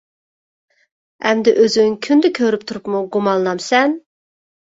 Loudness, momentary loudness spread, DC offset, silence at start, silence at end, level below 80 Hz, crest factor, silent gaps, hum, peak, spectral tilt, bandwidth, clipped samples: -16 LUFS; 9 LU; under 0.1%; 1.25 s; 0.7 s; -62 dBFS; 16 dB; none; none; -2 dBFS; -4.5 dB/octave; 8 kHz; under 0.1%